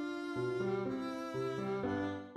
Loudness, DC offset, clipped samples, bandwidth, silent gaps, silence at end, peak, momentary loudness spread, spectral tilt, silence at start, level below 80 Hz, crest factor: -38 LUFS; under 0.1%; under 0.1%; 12.5 kHz; none; 0 s; -26 dBFS; 3 LU; -7 dB/octave; 0 s; -72 dBFS; 12 dB